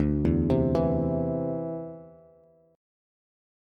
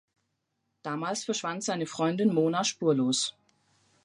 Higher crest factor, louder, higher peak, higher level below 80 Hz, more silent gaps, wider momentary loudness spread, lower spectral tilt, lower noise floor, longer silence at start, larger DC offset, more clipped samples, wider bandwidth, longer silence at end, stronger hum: about the same, 16 dB vs 18 dB; about the same, -27 LUFS vs -28 LUFS; about the same, -12 dBFS vs -12 dBFS; first, -40 dBFS vs -80 dBFS; neither; first, 14 LU vs 8 LU; first, -10.5 dB/octave vs -4 dB/octave; second, -59 dBFS vs -79 dBFS; second, 0 s vs 0.85 s; neither; neither; second, 6.2 kHz vs 11.5 kHz; first, 1.65 s vs 0.75 s; neither